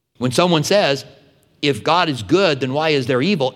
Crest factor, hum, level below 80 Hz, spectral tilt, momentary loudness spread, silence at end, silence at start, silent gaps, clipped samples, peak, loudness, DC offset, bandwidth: 16 dB; none; -60 dBFS; -5 dB/octave; 5 LU; 0 s; 0.2 s; none; under 0.1%; 0 dBFS; -17 LUFS; under 0.1%; 16 kHz